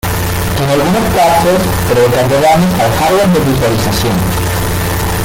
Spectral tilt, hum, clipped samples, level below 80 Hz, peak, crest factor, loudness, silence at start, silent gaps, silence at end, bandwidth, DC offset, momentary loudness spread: -5 dB/octave; none; under 0.1%; -26 dBFS; 0 dBFS; 10 dB; -11 LUFS; 0.05 s; none; 0 s; 17 kHz; under 0.1%; 6 LU